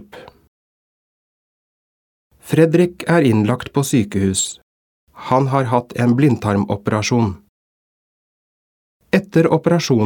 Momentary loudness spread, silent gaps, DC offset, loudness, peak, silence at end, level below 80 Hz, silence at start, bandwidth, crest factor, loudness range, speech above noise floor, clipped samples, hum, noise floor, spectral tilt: 6 LU; 0.48-2.30 s, 4.62-5.07 s, 7.49-9.00 s; under 0.1%; -17 LUFS; 0 dBFS; 0 s; -52 dBFS; 0.15 s; 18 kHz; 18 dB; 3 LU; over 74 dB; under 0.1%; none; under -90 dBFS; -6 dB/octave